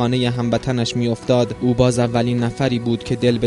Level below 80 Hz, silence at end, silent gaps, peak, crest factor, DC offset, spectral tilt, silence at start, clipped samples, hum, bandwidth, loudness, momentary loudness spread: -42 dBFS; 0 s; none; -2 dBFS; 16 dB; under 0.1%; -6.5 dB/octave; 0 s; under 0.1%; none; 11.5 kHz; -19 LUFS; 4 LU